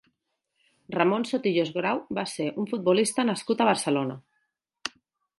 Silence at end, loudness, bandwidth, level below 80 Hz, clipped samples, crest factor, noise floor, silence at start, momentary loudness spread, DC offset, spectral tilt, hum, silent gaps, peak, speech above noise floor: 0.5 s; -26 LUFS; 12 kHz; -74 dBFS; under 0.1%; 20 dB; -79 dBFS; 0.9 s; 14 LU; under 0.1%; -4.5 dB/octave; none; none; -6 dBFS; 53 dB